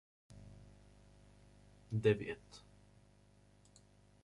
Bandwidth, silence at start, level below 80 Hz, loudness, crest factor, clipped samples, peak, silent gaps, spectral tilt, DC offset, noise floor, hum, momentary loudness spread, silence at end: 11.5 kHz; 0.3 s; -66 dBFS; -38 LUFS; 24 dB; under 0.1%; -20 dBFS; none; -7 dB/octave; under 0.1%; -67 dBFS; 50 Hz at -65 dBFS; 27 LU; 1.65 s